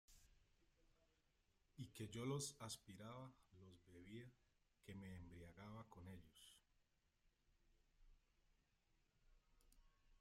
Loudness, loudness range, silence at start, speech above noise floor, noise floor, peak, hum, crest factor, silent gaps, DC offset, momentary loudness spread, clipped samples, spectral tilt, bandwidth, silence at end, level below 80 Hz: -56 LUFS; 11 LU; 0.1 s; 30 dB; -84 dBFS; -36 dBFS; none; 24 dB; none; under 0.1%; 19 LU; under 0.1%; -4.5 dB/octave; 15.5 kHz; 0.05 s; -76 dBFS